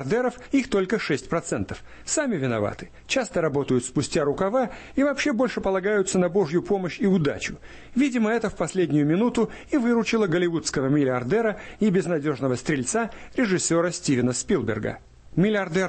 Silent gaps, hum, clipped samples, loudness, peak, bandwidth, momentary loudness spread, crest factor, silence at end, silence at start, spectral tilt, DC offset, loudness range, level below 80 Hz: none; none; under 0.1%; -24 LUFS; -10 dBFS; 8.8 kHz; 6 LU; 14 dB; 0 s; 0 s; -5 dB/octave; under 0.1%; 3 LU; -50 dBFS